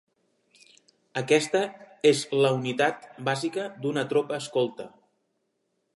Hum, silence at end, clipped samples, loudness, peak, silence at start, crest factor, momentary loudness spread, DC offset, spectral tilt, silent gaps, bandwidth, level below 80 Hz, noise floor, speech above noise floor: none; 1.1 s; under 0.1%; -26 LUFS; -8 dBFS; 1.15 s; 20 dB; 11 LU; under 0.1%; -4.5 dB/octave; none; 11.5 kHz; -78 dBFS; -76 dBFS; 50 dB